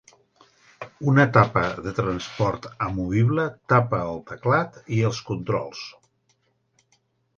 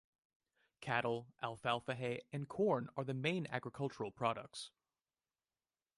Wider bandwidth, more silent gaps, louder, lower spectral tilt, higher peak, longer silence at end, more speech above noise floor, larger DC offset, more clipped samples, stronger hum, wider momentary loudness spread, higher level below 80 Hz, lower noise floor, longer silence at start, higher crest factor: second, 7.2 kHz vs 11.5 kHz; neither; first, -23 LUFS vs -41 LUFS; about the same, -7 dB/octave vs -6 dB/octave; first, 0 dBFS vs -20 dBFS; first, 1.45 s vs 1.3 s; second, 45 dB vs over 50 dB; neither; neither; neither; first, 13 LU vs 10 LU; first, -50 dBFS vs -78 dBFS; second, -68 dBFS vs under -90 dBFS; about the same, 0.8 s vs 0.8 s; about the same, 24 dB vs 22 dB